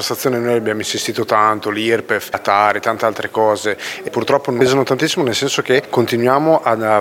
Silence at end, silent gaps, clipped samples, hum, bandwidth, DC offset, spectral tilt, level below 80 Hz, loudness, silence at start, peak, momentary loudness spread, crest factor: 0 s; none; under 0.1%; none; 17 kHz; under 0.1%; -4 dB/octave; -60 dBFS; -16 LUFS; 0 s; 0 dBFS; 5 LU; 16 dB